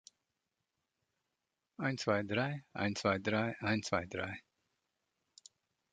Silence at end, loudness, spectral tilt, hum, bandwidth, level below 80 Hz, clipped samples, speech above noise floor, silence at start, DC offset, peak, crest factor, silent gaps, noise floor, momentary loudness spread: 1.55 s; -36 LUFS; -5 dB/octave; none; 9 kHz; -64 dBFS; under 0.1%; 52 dB; 1.8 s; under 0.1%; -16 dBFS; 22 dB; none; -88 dBFS; 8 LU